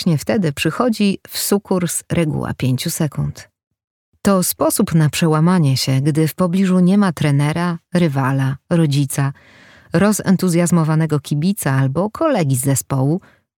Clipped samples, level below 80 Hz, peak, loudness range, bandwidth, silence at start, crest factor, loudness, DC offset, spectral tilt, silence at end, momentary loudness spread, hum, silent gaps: under 0.1%; -50 dBFS; -2 dBFS; 4 LU; 19 kHz; 0 s; 14 dB; -17 LUFS; under 0.1%; -6 dB/octave; 0.4 s; 6 LU; none; 3.67-3.71 s, 3.84-4.12 s